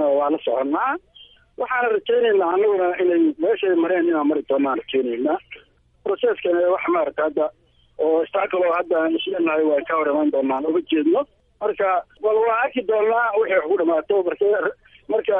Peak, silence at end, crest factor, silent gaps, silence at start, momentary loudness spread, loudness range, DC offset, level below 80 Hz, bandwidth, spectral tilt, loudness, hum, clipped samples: -6 dBFS; 0 s; 14 dB; none; 0 s; 6 LU; 3 LU; under 0.1%; -62 dBFS; 3.8 kHz; -8 dB/octave; -21 LUFS; none; under 0.1%